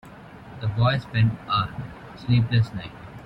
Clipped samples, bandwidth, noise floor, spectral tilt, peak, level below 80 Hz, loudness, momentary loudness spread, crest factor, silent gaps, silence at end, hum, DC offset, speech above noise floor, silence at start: under 0.1%; 5.6 kHz; -43 dBFS; -8 dB/octave; -8 dBFS; -48 dBFS; -24 LUFS; 18 LU; 16 dB; none; 0 s; none; under 0.1%; 20 dB; 0.05 s